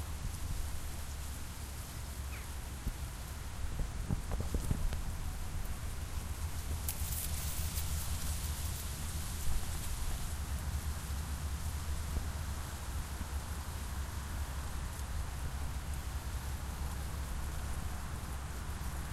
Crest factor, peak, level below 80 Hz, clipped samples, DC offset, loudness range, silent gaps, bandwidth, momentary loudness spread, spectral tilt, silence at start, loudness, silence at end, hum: 18 dB; -20 dBFS; -40 dBFS; under 0.1%; under 0.1%; 3 LU; none; 16 kHz; 6 LU; -4 dB/octave; 0 s; -41 LUFS; 0 s; none